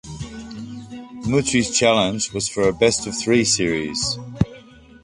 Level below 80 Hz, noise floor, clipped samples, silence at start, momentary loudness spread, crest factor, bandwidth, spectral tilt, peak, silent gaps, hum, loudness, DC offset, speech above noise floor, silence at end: -44 dBFS; -45 dBFS; under 0.1%; 0.05 s; 18 LU; 18 dB; 11.5 kHz; -3.5 dB/octave; -2 dBFS; none; none; -19 LUFS; under 0.1%; 25 dB; 0.4 s